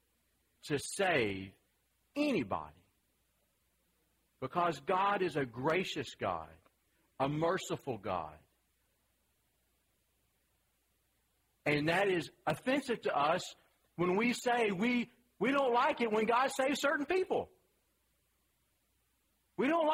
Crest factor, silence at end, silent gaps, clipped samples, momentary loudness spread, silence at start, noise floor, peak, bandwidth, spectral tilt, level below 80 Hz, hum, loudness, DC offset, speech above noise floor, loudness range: 18 dB; 0 s; none; under 0.1%; 13 LU; 0.65 s; -78 dBFS; -18 dBFS; 16 kHz; -5 dB/octave; -70 dBFS; none; -34 LUFS; under 0.1%; 44 dB; 8 LU